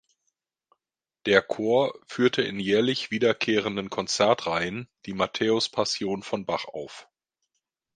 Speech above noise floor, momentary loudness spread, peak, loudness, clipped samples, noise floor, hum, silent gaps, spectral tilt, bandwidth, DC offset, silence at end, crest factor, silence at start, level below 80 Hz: 61 dB; 11 LU; -2 dBFS; -25 LUFS; under 0.1%; -87 dBFS; none; none; -4 dB/octave; 9.8 kHz; under 0.1%; 0.9 s; 24 dB; 1.25 s; -64 dBFS